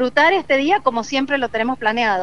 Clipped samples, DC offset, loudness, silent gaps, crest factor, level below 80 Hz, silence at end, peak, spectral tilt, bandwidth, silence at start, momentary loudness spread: under 0.1%; 1%; -18 LUFS; none; 16 dB; -52 dBFS; 0 s; 0 dBFS; -3.5 dB/octave; 11 kHz; 0 s; 6 LU